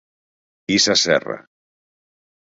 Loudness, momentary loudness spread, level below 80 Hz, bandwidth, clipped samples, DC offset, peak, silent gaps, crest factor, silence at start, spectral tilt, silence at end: -16 LUFS; 18 LU; -60 dBFS; 8 kHz; under 0.1%; under 0.1%; -2 dBFS; none; 20 dB; 0.7 s; -2 dB/octave; 1.05 s